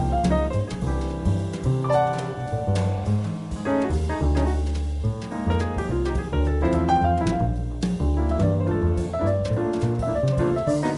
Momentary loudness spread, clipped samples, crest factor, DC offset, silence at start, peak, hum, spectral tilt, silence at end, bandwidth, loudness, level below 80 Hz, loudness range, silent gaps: 5 LU; under 0.1%; 14 dB; under 0.1%; 0 s; -10 dBFS; none; -7.5 dB/octave; 0 s; 11.5 kHz; -24 LUFS; -30 dBFS; 2 LU; none